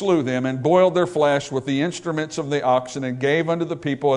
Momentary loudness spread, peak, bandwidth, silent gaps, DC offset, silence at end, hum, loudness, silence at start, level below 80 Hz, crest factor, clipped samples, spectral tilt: 8 LU; -4 dBFS; 10.5 kHz; none; under 0.1%; 0 s; none; -21 LUFS; 0 s; -62 dBFS; 16 dB; under 0.1%; -6 dB/octave